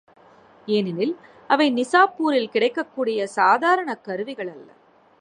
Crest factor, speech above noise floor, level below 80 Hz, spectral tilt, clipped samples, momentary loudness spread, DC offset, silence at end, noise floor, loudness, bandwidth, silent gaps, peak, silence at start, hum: 20 dB; 30 dB; -76 dBFS; -5 dB/octave; under 0.1%; 13 LU; under 0.1%; 0.55 s; -51 dBFS; -21 LUFS; 11 kHz; none; -2 dBFS; 0.65 s; none